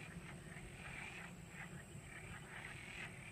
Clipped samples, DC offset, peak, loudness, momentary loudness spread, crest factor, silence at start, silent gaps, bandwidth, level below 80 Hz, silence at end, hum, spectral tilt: under 0.1%; under 0.1%; -36 dBFS; -52 LUFS; 4 LU; 16 dB; 0 s; none; 15.5 kHz; -64 dBFS; 0 s; none; -4 dB/octave